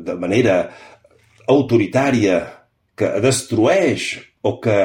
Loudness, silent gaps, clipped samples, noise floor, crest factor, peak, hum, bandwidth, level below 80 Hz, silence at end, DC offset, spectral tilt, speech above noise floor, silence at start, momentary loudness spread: -17 LUFS; none; under 0.1%; -52 dBFS; 16 dB; -2 dBFS; none; 16.5 kHz; -54 dBFS; 0 s; under 0.1%; -5.5 dB/octave; 35 dB; 0 s; 9 LU